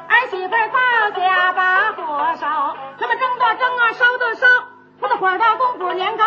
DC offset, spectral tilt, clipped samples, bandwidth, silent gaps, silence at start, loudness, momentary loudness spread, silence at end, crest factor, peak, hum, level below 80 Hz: under 0.1%; 2 dB/octave; under 0.1%; 7 kHz; none; 0 s; -17 LUFS; 7 LU; 0 s; 16 dB; -2 dBFS; none; -72 dBFS